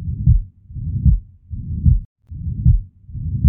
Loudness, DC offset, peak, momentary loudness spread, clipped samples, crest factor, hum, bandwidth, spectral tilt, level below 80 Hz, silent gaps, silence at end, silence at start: -20 LUFS; under 0.1%; -2 dBFS; 17 LU; under 0.1%; 16 dB; none; 0.5 kHz; -19 dB/octave; -22 dBFS; 2.05-2.16 s; 0 s; 0 s